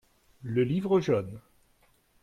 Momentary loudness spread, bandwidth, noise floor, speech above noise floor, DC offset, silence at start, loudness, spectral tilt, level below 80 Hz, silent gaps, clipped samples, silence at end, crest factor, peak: 19 LU; 10 kHz; -66 dBFS; 39 dB; under 0.1%; 0.4 s; -28 LUFS; -8 dB/octave; -62 dBFS; none; under 0.1%; 0.85 s; 16 dB; -14 dBFS